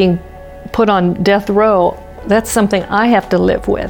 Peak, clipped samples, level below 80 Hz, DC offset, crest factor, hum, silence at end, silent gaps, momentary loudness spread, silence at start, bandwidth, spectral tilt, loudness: -2 dBFS; under 0.1%; -34 dBFS; under 0.1%; 12 dB; none; 0 s; none; 8 LU; 0 s; 19 kHz; -5.5 dB/octave; -13 LUFS